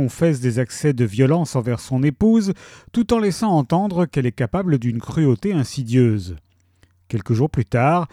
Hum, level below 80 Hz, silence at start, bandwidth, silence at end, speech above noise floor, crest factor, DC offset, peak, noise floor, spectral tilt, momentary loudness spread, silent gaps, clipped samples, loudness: none; -46 dBFS; 0 s; 14 kHz; 0.05 s; 39 dB; 16 dB; under 0.1%; -4 dBFS; -57 dBFS; -7.5 dB/octave; 8 LU; none; under 0.1%; -20 LUFS